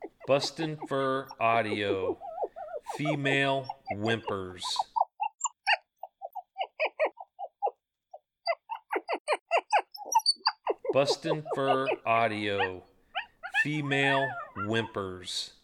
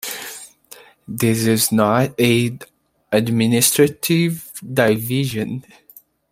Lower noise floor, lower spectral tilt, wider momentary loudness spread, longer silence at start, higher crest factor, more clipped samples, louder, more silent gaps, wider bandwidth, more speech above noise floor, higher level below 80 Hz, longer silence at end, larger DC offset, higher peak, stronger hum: first, -55 dBFS vs -45 dBFS; about the same, -4 dB/octave vs -4.5 dB/octave; second, 12 LU vs 18 LU; about the same, 0 s vs 0.05 s; about the same, 20 dB vs 20 dB; neither; second, -30 LUFS vs -17 LUFS; first, 9.20-9.25 s, 9.41-9.46 s vs none; about the same, 15.5 kHz vs 16.5 kHz; about the same, 26 dB vs 28 dB; second, -72 dBFS vs -56 dBFS; second, 0.15 s vs 0.7 s; neither; second, -12 dBFS vs 0 dBFS; neither